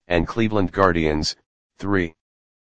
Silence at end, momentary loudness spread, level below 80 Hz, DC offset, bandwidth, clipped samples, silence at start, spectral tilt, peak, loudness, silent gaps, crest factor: 0.45 s; 12 LU; -38 dBFS; under 0.1%; 9.8 kHz; under 0.1%; 0 s; -5.5 dB/octave; 0 dBFS; -21 LUFS; 1.46-1.70 s; 22 dB